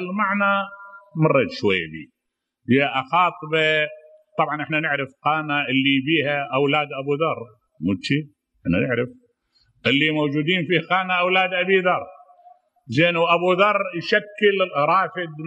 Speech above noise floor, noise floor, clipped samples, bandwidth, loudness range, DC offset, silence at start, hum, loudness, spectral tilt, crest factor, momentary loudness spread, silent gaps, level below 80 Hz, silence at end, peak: 59 dB; -79 dBFS; under 0.1%; 8.6 kHz; 3 LU; under 0.1%; 0 s; none; -20 LUFS; -6.5 dB/octave; 18 dB; 8 LU; none; -60 dBFS; 0 s; -4 dBFS